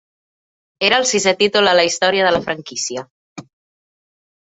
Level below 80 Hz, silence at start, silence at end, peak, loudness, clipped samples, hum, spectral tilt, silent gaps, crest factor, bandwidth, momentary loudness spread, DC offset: -58 dBFS; 0.8 s; 1.1 s; 0 dBFS; -15 LUFS; under 0.1%; none; -2 dB/octave; 3.11-3.36 s; 18 dB; 8.4 kHz; 11 LU; under 0.1%